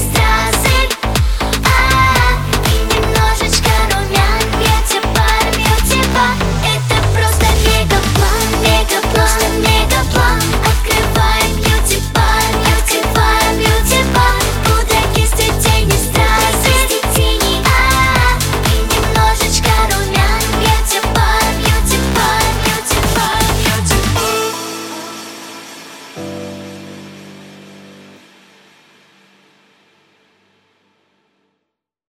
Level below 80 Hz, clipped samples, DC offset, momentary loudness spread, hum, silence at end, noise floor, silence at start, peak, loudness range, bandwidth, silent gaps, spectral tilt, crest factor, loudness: -18 dBFS; under 0.1%; under 0.1%; 5 LU; none; 4.3 s; -76 dBFS; 0 s; 0 dBFS; 7 LU; 17.5 kHz; none; -3.5 dB/octave; 14 dB; -12 LUFS